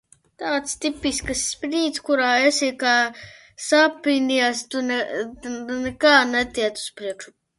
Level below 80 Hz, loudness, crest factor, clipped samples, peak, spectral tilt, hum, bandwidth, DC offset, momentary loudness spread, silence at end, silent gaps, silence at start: -52 dBFS; -21 LUFS; 20 dB; under 0.1%; -2 dBFS; -2 dB/octave; none; 11.5 kHz; under 0.1%; 14 LU; 0.3 s; none; 0.4 s